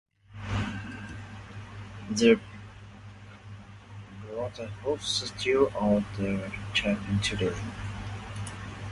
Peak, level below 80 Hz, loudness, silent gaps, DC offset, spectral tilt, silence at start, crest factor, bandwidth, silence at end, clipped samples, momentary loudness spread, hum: -8 dBFS; -48 dBFS; -29 LUFS; none; under 0.1%; -5 dB/octave; 0.3 s; 22 dB; 11.5 kHz; 0 s; under 0.1%; 22 LU; none